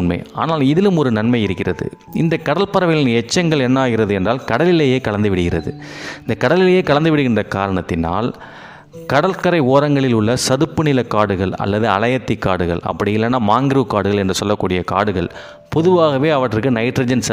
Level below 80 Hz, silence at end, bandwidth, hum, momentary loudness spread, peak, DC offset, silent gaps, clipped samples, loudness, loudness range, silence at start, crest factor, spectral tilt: -46 dBFS; 0 s; 16 kHz; none; 8 LU; 0 dBFS; under 0.1%; none; under 0.1%; -16 LUFS; 1 LU; 0 s; 16 dB; -6 dB/octave